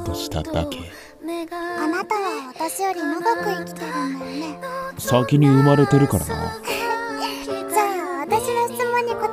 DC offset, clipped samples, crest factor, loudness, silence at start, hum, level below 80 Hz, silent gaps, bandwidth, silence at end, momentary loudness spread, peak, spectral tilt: under 0.1%; under 0.1%; 20 dB; -22 LUFS; 0 s; none; -44 dBFS; none; 16 kHz; 0 s; 14 LU; -2 dBFS; -6 dB/octave